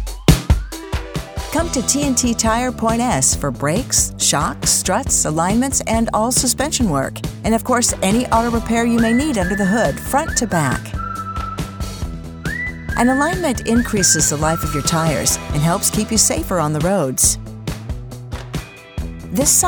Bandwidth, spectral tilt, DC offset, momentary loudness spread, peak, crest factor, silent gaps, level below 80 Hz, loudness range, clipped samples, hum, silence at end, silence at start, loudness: over 20 kHz; -3.5 dB/octave; under 0.1%; 13 LU; 0 dBFS; 18 dB; none; -30 dBFS; 4 LU; under 0.1%; none; 0 s; 0 s; -17 LUFS